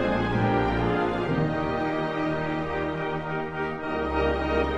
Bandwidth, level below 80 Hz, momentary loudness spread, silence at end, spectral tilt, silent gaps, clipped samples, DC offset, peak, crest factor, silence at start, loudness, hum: 9.6 kHz; -40 dBFS; 6 LU; 0 s; -8 dB/octave; none; under 0.1%; under 0.1%; -12 dBFS; 14 dB; 0 s; -27 LUFS; none